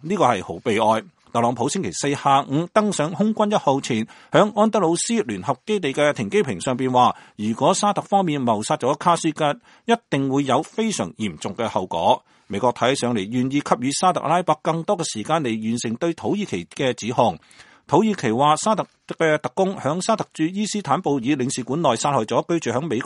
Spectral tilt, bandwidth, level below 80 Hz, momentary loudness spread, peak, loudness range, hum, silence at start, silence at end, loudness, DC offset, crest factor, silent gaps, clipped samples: -5 dB/octave; 11.5 kHz; -62 dBFS; 6 LU; 0 dBFS; 2 LU; none; 0.05 s; 0 s; -21 LUFS; under 0.1%; 20 dB; none; under 0.1%